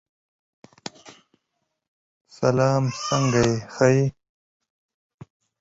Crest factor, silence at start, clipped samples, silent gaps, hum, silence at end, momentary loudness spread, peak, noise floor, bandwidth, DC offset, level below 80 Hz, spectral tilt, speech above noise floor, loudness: 22 dB; 1.05 s; under 0.1%; 1.88-2.25 s; none; 1.5 s; 20 LU; -4 dBFS; -78 dBFS; 8 kHz; under 0.1%; -54 dBFS; -6 dB/octave; 58 dB; -22 LUFS